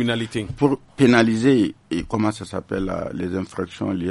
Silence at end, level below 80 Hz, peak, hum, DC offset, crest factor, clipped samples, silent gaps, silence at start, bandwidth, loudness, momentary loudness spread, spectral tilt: 0 s; -46 dBFS; -4 dBFS; none; under 0.1%; 18 dB; under 0.1%; none; 0 s; 11.5 kHz; -21 LUFS; 12 LU; -6.5 dB/octave